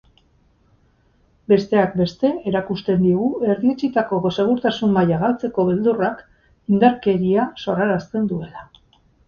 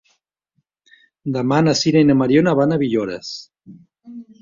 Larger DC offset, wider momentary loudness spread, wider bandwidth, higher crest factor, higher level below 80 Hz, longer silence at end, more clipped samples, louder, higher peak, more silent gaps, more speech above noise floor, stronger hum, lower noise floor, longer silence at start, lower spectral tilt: neither; second, 8 LU vs 18 LU; about the same, 7 kHz vs 7.6 kHz; about the same, 18 dB vs 16 dB; about the same, -52 dBFS vs -56 dBFS; first, 0.65 s vs 0.2 s; neither; about the same, -19 LUFS vs -17 LUFS; about the same, -2 dBFS vs -2 dBFS; neither; second, 40 dB vs 54 dB; neither; second, -59 dBFS vs -71 dBFS; first, 1.5 s vs 1.25 s; first, -8 dB/octave vs -6 dB/octave